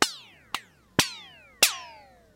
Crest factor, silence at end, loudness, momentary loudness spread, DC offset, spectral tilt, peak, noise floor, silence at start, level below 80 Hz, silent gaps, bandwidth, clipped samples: 28 dB; 0.45 s; -26 LUFS; 21 LU; under 0.1%; -1 dB/octave; -2 dBFS; -51 dBFS; 0 s; -58 dBFS; none; 16.5 kHz; under 0.1%